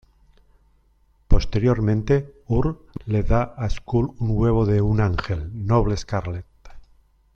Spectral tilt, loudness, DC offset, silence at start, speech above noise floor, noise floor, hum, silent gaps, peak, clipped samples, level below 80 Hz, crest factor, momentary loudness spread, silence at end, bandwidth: -8 dB/octave; -23 LUFS; under 0.1%; 1.3 s; 39 dB; -60 dBFS; none; none; -2 dBFS; under 0.1%; -30 dBFS; 20 dB; 8 LU; 0.55 s; 7 kHz